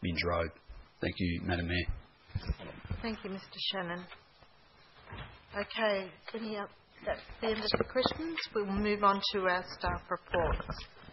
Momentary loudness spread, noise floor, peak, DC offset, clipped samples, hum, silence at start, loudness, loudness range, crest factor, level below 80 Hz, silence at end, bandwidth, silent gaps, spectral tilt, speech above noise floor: 13 LU; -61 dBFS; -10 dBFS; under 0.1%; under 0.1%; none; 0 s; -35 LUFS; 8 LU; 26 dB; -48 dBFS; 0 s; 5.8 kHz; none; -3.5 dB/octave; 27 dB